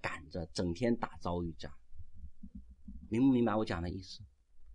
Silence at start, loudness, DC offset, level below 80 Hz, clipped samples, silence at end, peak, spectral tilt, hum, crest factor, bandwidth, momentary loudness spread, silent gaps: 0.05 s; -35 LUFS; under 0.1%; -54 dBFS; under 0.1%; 0 s; -18 dBFS; -7 dB/octave; none; 18 dB; 10.5 kHz; 25 LU; none